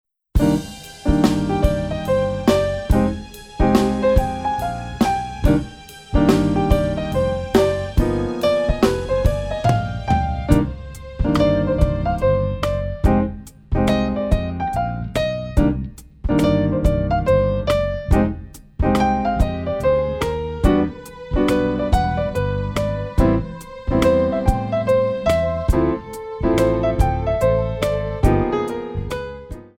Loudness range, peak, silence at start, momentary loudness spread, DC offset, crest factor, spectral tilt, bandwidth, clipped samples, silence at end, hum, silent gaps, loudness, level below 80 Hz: 2 LU; 0 dBFS; 0.35 s; 8 LU; under 0.1%; 18 dB; -7 dB/octave; 16.5 kHz; under 0.1%; 0.1 s; none; none; -20 LUFS; -26 dBFS